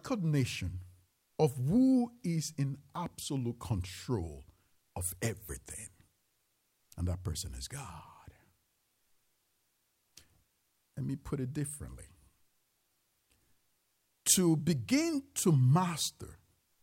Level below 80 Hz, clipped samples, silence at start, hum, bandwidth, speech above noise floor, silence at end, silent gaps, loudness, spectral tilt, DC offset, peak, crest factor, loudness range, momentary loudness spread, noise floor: -56 dBFS; under 0.1%; 0.05 s; none; 16 kHz; 45 dB; 0.45 s; none; -33 LUFS; -5 dB/octave; under 0.1%; -12 dBFS; 22 dB; 14 LU; 21 LU; -78 dBFS